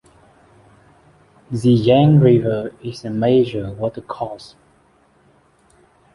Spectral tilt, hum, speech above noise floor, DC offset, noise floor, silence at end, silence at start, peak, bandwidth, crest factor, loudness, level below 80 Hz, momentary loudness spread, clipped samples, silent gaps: -8.5 dB/octave; none; 39 dB; under 0.1%; -56 dBFS; 1.7 s; 1.5 s; -2 dBFS; 11.5 kHz; 18 dB; -17 LUFS; -50 dBFS; 17 LU; under 0.1%; none